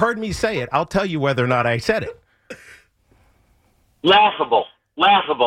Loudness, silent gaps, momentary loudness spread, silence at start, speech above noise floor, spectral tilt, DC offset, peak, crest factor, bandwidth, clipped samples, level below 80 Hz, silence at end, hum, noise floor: -18 LUFS; none; 19 LU; 0 s; 42 dB; -5 dB/octave; under 0.1%; -4 dBFS; 16 dB; 15 kHz; under 0.1%; -48 dBFS; 0 s; none; -60 dBFS